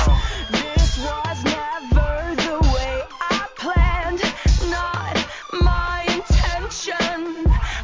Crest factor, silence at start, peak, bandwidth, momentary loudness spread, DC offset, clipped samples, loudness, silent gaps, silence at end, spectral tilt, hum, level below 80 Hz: 16 dB; 0 s; -4 dBFS; 7.6 kHz; 5 LU; under 0.1%; under 0.1%; -21 LUFS; none; 0 s; -5 dB/octave; none; -22 dBFS